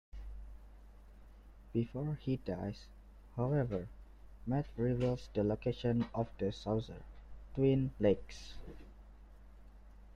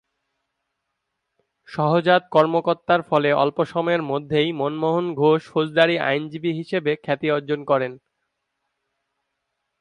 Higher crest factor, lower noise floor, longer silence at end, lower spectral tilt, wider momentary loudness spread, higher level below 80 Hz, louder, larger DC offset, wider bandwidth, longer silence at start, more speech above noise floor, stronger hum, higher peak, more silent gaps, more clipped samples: about the same, 20 dB vs 20 dB; second, -56 dBFS vs -78 dBFS; second, 0.05 s vs 1.85 s; about the same, -8.5 dB/octave vs -7.5 dB/octave; first, 21 LU vs 6 LU; first, -52 dBFS vs -66 dBFS; second, -37 LUFS vs -21 LUFS; neither; second, 8.6 kHz vs 10 kHz; second, 0.15 s vs 1.7 s; second, 20 dB vs 58 dB; first, 50 Hz at -55 dBFS vs none; second, -18 dBFS vs -4 dBFS; neither; neither